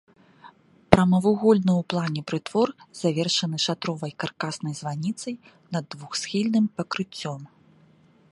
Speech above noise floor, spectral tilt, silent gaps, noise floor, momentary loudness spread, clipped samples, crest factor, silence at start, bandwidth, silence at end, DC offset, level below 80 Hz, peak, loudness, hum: 32 dB; -5.5 dB/octave; none; -57 dBFS; 13 LU; under 0.1%; 26 dB; 0.45 s; 11.5 kHz; 0.85 s; under 0.1%; -54 dBFS; 0 dBFS; -25 LUFS; none